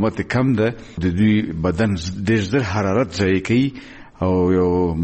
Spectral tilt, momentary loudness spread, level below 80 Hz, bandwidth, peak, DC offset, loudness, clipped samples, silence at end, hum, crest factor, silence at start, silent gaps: -7 dB/octave; 6 LU; -40 dBFS; 8.6 kHz; -8 dBFS; under 0.1%; -19 LUFS; under 0.1%; 0 s; none; 12 dB; 0 s; none